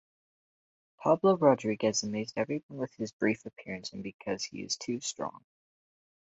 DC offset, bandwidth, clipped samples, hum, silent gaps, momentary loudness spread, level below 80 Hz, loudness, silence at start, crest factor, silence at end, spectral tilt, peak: under 0.1%; 8.2 kHz; under 0.1%; none; 2.63-2.69 s, 3.13-3.19 s, 4.14-4.19 s; 15 LU; -70 dBFS; -31 LUFS; 1 s; 22 dB; 0.9 s; -4.5 dB/octave; -10 dBFS